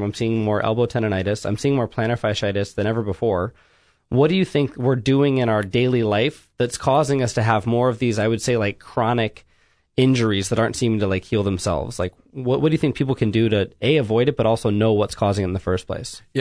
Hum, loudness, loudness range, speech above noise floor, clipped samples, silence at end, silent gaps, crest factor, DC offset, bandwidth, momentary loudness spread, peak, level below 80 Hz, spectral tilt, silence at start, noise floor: none; -21 LUFS; 2 LU; 39 dB; under 0.1%; 0 s; none; 18 dB; under 0.1%; 11 kHz; 6 LU; -4 dBFS; -48 dBFS; -6 dB/octave; 0 s; -59 dBFS